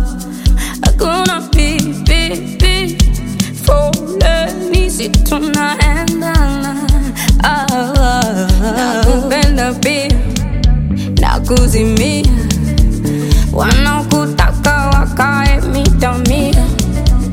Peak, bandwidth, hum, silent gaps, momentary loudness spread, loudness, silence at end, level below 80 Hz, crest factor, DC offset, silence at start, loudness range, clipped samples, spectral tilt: 0 dBFS; 16.5 kHz; none; none; 3 LU; -13 LUFS; 0 s; -14 dBFS; 12 dB; under 0.1%; 0 s; 1 LU; under 0.1%; -5 dB/octave